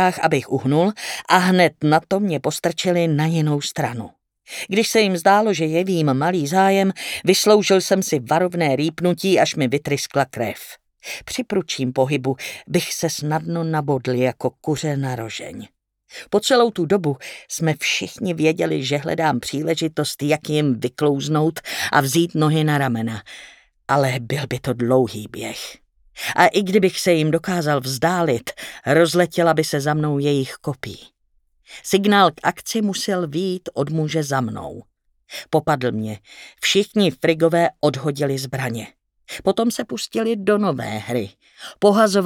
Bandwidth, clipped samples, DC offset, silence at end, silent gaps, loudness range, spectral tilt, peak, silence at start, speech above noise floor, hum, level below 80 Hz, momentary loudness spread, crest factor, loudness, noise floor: 18 kHz; under 0.1%; under 0.1%; 0 s; none; 5 LU; -5 dB/octave; 0 dBFS; 0 s; 44 dB; none; -58 dBFS; 13 LU; 20 dB; -20 LUFS; -63 dBFS